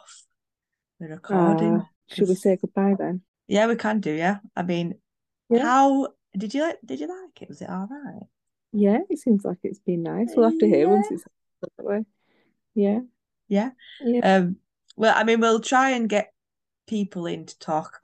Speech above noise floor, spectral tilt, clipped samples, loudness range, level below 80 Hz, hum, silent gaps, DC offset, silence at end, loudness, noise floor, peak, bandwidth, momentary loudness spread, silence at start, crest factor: 66 dB; -6 dB/octave; under 0.1%; 5 LU; -74 dBFS; none; 1.96-2.01 s, 3.28-3.34 s; under 0.1%; 0.05 s; -23 LUFS; -88 dBFS; -6 dBFS; 12 kHz; 16 LU; 1 s; 18 dB